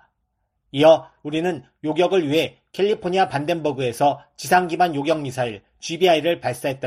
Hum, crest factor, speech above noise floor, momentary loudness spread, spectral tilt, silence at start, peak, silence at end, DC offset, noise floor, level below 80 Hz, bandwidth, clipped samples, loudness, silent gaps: none; 18 dB; 53 dB; 11 LU; -5 dB/octave; 0.75 s; -4 dBFS; 0 s; under 0.1%; -73 dBFS; -62 dBFS; 14 kHz; under 0.1%; -21 LUFS; none